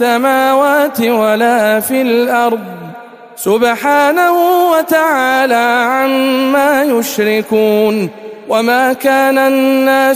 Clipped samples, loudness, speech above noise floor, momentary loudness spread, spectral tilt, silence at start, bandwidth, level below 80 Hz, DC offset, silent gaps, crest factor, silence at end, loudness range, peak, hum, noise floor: under 0.1%; -11 LUFS; 21 dB; 5 LU; -4 dB/octave; 0 s; 15.5 kHz; -58 dBFS; under 0.1%; none; 10 dB; 0 s; 2 LU; 0 dBFS; none; -32 dBFS